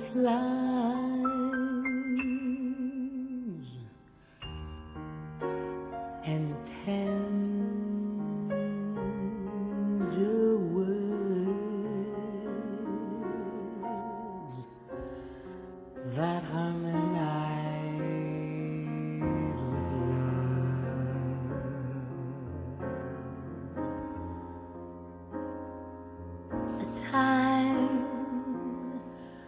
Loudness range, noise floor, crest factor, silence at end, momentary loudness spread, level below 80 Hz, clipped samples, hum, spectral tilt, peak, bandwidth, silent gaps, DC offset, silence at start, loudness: 9 LU; -57 dBFS; 20 dB; 0 s; 15 LU; -54 dBFS; under 0.1%; none; -7 dB/octave; -14 dBFS; 4 kHz; none; under 0.1%; 0 s; -33 LUFS